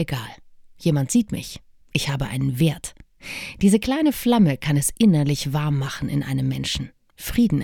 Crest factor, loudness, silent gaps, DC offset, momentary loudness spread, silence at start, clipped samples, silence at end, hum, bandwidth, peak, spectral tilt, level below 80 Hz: 18 dB; -22 LUFS; none; under 0.1%; 16 LU; 0 s; under 0.1%; 0 s; none; 18.5 kHz; -4 dBFS; -5.5 dB/octave; -44 dBFS